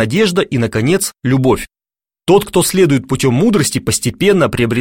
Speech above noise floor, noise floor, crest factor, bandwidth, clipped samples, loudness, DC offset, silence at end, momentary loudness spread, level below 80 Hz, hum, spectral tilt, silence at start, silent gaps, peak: over 77 dB; under -90 dBFS; 12 dB; 16.5 kHz; under 0.1%; -13 LUFS; 0.4%; 0 s; 4 LU; -40 dBFS; none; -5 dB/octave; 0 s; none; 0 dBFS